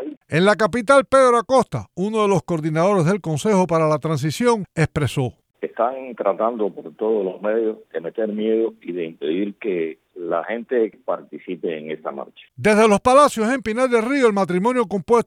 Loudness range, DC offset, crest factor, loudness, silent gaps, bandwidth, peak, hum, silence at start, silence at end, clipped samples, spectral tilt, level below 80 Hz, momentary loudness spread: 7 LU; under 0.1%; 18 dB; -20 LUFS; 0.17-0.21 s; 14.5 kHz; -2 dBFS; none; 0 s; 0.05 s; under 0.1%; -6 dB/octave; -52 dBFS; 14 LU